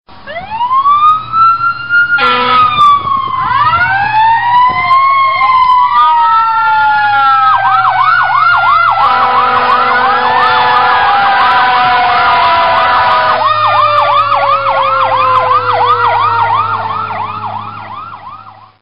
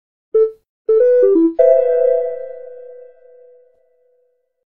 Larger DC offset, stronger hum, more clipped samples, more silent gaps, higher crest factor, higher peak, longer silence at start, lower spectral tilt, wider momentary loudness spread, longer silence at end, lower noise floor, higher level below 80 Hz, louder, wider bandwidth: first, 2% vs under 0.1%; neither; neither; second, none vs 0.69-0.85 s; second, 10 dB vs 16 dB; about the same, 0 dBFS vs -2 dBFS; about the same, 0.25 s vs 0.35 s; about the same, -5 dB/octave vs -6 dB/octave; second, 8 LU vs 21 LU; second, 0.15 s vs 1.75 s; second, -33 dBFS vs -63 dBFS; first, -44 dBFS vs -60 dBFS; first, -8 LUFS vs -14 LUFS; first, 5.8 kHz vs 2.8 kHz